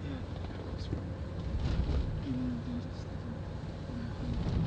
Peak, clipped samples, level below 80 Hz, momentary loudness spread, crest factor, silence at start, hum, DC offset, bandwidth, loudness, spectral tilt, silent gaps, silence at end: -20 dBFS; under 0.1%; -40 dBFS; 7 LU; 16 dB; 0 s; none; under 0.1%; 8.6 kHz; -38 LUFS; -8 dB/octave; none; 0 s